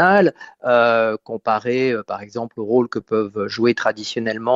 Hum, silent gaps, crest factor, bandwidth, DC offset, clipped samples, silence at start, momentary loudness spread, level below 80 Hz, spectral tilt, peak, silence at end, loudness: none; none; 16 dB; 8 kHz; under 0.1%; under 0.1%; 0 s; 12 LU; -64 dBFS; -6 dB/octave; -2 dBFS; 0 s; -20 LUFS